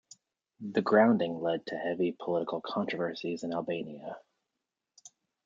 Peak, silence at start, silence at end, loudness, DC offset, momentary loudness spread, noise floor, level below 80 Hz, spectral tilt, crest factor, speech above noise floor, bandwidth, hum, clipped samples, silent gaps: -10 dBFS; 0.6 s; 0.4 s; -31 LUFS; under 0.1%; 18 LU; -87 dBFS; -78 dBFS; -6.5 dB/octave; 22 dB; 57 dB; 7.6 kHz; none; under 0.1%; none